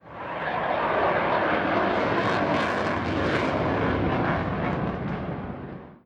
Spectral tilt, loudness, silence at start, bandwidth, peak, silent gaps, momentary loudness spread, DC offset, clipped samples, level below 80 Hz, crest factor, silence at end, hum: -7 dB/octave; -25 LUFS; 0.05 s; 10.5 kHz; -10 dBFS; none; 9 LU; under 0.1%; under 0.1%; -44 dBFS; 16 dB; 0.1 s; none